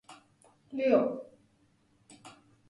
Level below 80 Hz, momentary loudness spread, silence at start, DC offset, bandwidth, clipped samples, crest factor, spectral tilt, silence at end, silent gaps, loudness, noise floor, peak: -78 dBFS; 27 LU; 0.1 s; under 0.1%; 11.5 kHz; under 0.1%; 22 dB; -6.5 dB/octave; 0.4 s; none; -30 LUFS; -68 dBFS; -12 dBFS